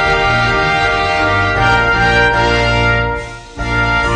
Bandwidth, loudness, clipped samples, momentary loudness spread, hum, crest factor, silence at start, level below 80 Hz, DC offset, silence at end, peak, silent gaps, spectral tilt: 10 kHz; -12 LUFS; under 0.1%; 8 LU; none; 12 dB; 0 s; -24 dBFS; under 0.1%; 0 s; 0 dBFS; none; -5 dB/octave